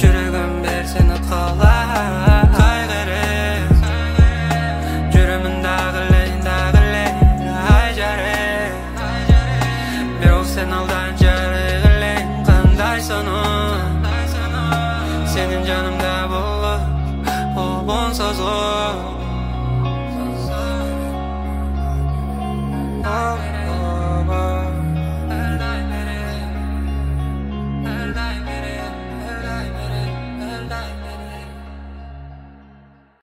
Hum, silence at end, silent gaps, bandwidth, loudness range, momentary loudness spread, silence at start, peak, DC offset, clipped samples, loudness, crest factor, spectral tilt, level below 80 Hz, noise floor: none; 0.65 s; none; 16 kHz; 9 LU; 12 LU; 0 s; 0 dBFS; under 0.1%; under 0.1%; -19 LUFS; 16 dB; -6 dB/octave; -20 dBFS; -48 dBFS